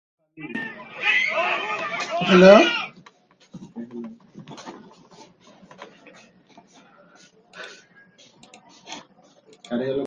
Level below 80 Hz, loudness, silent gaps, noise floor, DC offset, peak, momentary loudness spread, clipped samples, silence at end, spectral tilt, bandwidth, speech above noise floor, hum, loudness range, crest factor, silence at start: -64 dBFS; -18 LUFS; none; -55 dBFS; under 0.1%; 0 dBFS; 28 LU; under 0.1%; 0 s; -5.5 dB/octave; 7.8 kHz; 38 dB; none; 23 LU; 24 dB; 0.4 s